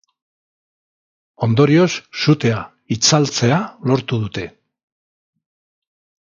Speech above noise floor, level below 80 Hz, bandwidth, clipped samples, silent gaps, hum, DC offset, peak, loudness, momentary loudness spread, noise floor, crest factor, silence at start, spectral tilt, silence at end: over 74 dB; -54 dBFS; 7.6 kHz; under 0.1%; none; none; under 0.1%; 0 dBFS; -17 LUFS; 13 LU; under -90 dBFS; 20 dB; 1.4 s; -5 dB/octave; 1.8 s